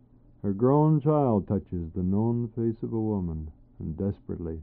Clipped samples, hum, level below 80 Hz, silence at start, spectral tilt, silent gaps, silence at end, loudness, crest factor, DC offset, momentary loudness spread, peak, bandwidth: under 0.1%; none; -48 dBFS; 0.45 s; -12.5 dB/octave; none; 0 s; -27 LUFS; 16 dB; under 0.1%; 13 LU; -10 dBFS; 3.3 kHz